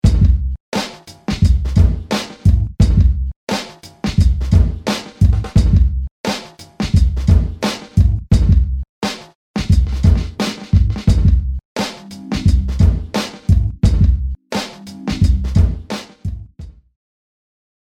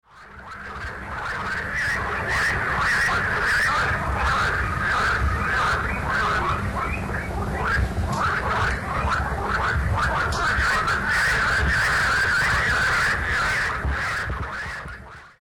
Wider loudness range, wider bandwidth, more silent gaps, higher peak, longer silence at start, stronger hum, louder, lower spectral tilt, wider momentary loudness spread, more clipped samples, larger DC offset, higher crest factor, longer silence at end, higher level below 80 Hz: about the same, 2 LU vs 4 LU; second, 11.5 kHz vs 18 kHz; first, 0.60-0.72 s, 3.36-3.47 s, 6.11-6.24 s, 8.89-9.02 s, 9.35-9.54 s, 11.65-11.76 s vs none; first, 0 dBFS vs -12 dBFS; about the same, 0.05 s vs 0.15 s; neither; first, -17 LUFS vs -22 LUFS; first, -6.5 dB/octave vs -4 dB/octave; about the same, 12 LU vs 10 LU; neither; neither; about the same, 14 dB vs 12 dB; first, 1.2 s vs 0.1 s; first, -18 dBFS vs -32 dBFS